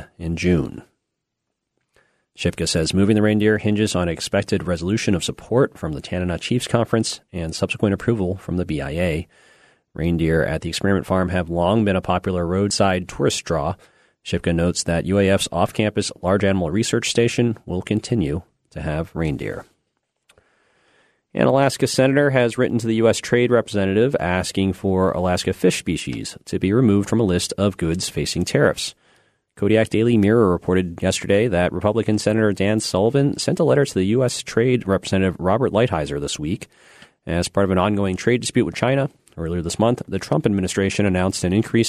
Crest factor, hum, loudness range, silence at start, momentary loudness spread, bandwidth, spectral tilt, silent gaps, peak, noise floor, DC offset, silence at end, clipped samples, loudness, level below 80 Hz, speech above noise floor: 18 dB; none; 4 LU; 0 s; 8 LU; 13.5 kHz; -5.5 dB/octave; none; -2 dBFS; -79 dBFS; under 0.1%; 0 s; under 0.1%; -20 LUFS; -42 dBFS; 59 dB